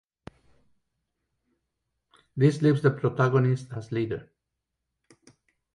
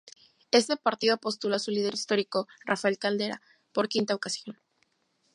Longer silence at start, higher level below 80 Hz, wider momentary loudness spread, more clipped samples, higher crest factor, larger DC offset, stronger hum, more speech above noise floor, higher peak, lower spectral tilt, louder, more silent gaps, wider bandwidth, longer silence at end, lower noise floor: first, 2.35 s vs 0.05 s; first, -64 dBFS vs -82 dBFS; about the same, 11 LU vs 9 LU; neither; about the same, 20 dB vs 22 dB; neither; neither; first, 60 dB vs 44 dB; about the same, -8 dBFS vs -8 dBFS; first, -8.5 dB/octave vs -3.5 dB/octave; first, -25 LUFS vs -28 LUFS; neither; about the same, 11 kHz vs 11.5 kHz; first, 1.55 s vs 0.85 s; first, -84 dBFS vs -73 dBFS